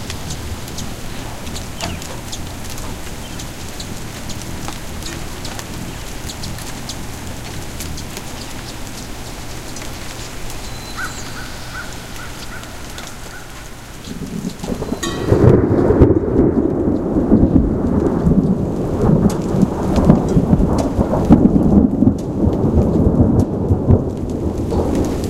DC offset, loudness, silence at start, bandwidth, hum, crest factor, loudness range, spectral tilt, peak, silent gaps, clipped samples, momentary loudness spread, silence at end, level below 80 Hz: under 0.1%; -18 LUFS; 0 s; 16.5 kHz; none; 18 dB; 14 LU; -6.5 dB/octave; 0 dBFS; none; under 0.1%; 17 LU; 0 s; -28 dBFS